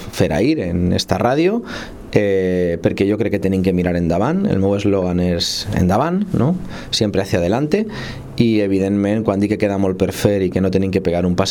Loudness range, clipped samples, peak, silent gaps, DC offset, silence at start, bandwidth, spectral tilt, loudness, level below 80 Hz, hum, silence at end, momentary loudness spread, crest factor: 1 LU; under 0.1%; 0 dBFS; none; under 0.1%; 0 s; 17.5 kHz; -6.5 dB/octave; -17 LUFS; -40 dBFS; none; 0 s; 3 LU; 16 dB